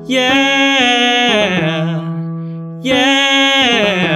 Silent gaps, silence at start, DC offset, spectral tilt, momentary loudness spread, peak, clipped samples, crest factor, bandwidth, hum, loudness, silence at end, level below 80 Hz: none; 0 s; under 0.1%; -4 dB/octave; 13 LU; 0 dBFS; under 0.1%; 14 dB; 14.5 kHz; none; -11 LUFS; 0 s; -52 dBFS